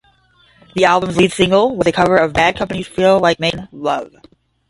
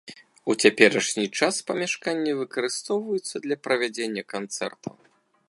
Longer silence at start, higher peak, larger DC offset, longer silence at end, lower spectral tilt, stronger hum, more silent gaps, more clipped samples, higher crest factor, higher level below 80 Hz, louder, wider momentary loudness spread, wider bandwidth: first, 0.75 s vs 0.05 s; about the same, 0 dBFS vs 0 dBFS; neither; about the same, 0.6 s vs 0.6 s; first, -5 dB/octave vs -3 dB/octave; neither; neither; neither; second, 16 dB vs 24 dB; first, -44 dBFS vs -76 dBFS; first, -15 LUFS vs -25 LUFS; second, 10 LU vs 13 LU; about the same, 11.5 kHz vs 11.5 kHz